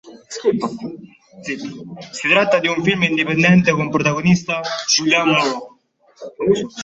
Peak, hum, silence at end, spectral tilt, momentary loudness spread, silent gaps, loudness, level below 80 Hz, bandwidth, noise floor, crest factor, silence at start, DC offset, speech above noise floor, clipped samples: -2 dBFS; none; 0 s; -4.5 dB/octave; 18 LU; none; -17 LUFS; -54 dBFS; 8 kHz; -53 dBFS; 16 dB; 0.05 s; under 0.1%; 36 dB; under 0.1%